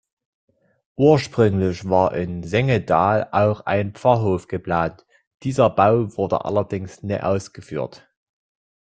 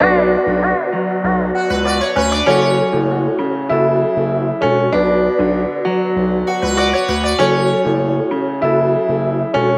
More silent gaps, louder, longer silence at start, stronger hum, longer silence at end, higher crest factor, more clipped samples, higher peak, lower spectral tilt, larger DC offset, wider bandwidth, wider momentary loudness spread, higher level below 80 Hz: first, 5.27-5.38 s vs none; second, -20 LUFS vs -16 LUFS; first, 1 s vs 0 s; neither; first, 0.95 s vs 0 s; about the same, 20 dB vs 16 dB; neither; about the same, -2 dBFS vs 0 dBFS; first, -7.5 dB/octave vs -5.5 dB/octave; neither; second, 9 kHz vs 12 kHz; first, 13 LU vs 4 LU; second, -52 dBFS vs -34 dBFS